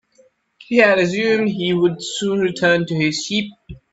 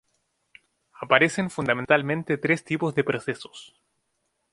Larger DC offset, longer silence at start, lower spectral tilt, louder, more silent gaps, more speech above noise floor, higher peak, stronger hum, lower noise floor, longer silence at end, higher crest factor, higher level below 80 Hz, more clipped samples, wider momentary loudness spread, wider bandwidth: neither; second, 0.6 s vs 1 s; about the same, -5 dB/octave vs -5.5 dB/octave; first, -18 LUFS vs -24 LUFS; neither; second, 38 dB vs 51 dB; about the same, 0 dBFS vs 0 dBFS; neither; second, -56 dBFS vs -75 dBFS; second, 0.15 s vs 0.9 s; second, 18 dB vs 26 dB; first, -52 dBFS vs -64 dBFS; neither; second, 8 LU vs 17 LU; second, 8.2 kHz vs 11.5 kHz